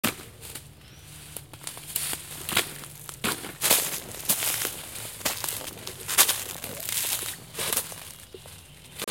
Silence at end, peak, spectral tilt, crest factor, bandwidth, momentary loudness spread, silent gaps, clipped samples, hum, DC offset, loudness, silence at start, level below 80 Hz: 0 s; -2 dBFS; -0.5 dB/octave; 30 dB; 17 kHz; 22 LU; none; under 0.1%; none; under 0.1%; -27 LUFS; 0.05 s; -58 dBFS